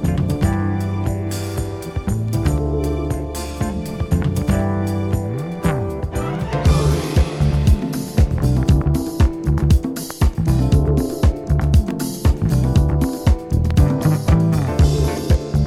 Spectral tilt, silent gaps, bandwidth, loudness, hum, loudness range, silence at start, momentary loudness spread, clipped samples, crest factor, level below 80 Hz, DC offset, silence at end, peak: -7 dB/octave; none; 15 kHz; -19 LUFS; none; 4 LU; 0 s; 8 LU; under 0.1%; 14 dB; -22 dBFS; under 0.1%; 0 s; -4 dBFS